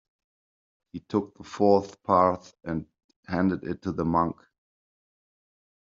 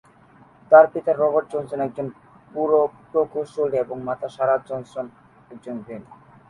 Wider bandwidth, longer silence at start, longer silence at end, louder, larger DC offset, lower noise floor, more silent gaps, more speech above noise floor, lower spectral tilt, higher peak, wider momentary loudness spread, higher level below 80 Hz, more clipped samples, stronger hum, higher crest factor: second, 7.6 kHz vs 10.5 kHz; first, 0.95 s vs 0.7 s; first, 1.5 s vs 0.35 s; second, -26 LUFS vs -21 LUFS; neither; first, under -90 dBFS vs -52 dBFS; first, 3.04-3.09 s, 3.16-3.23 s vs none; first, over 64 dB vs 31 dB; about the same, -7 dB/octave vs -7.5 dB/octave; second, -6 dBFS vs -2 dBFS; second, 15 LU vs 20 LU; first, -60 dBFS vs -66 dBFS; neither; neither; about the same, 22 dB vs 22 dB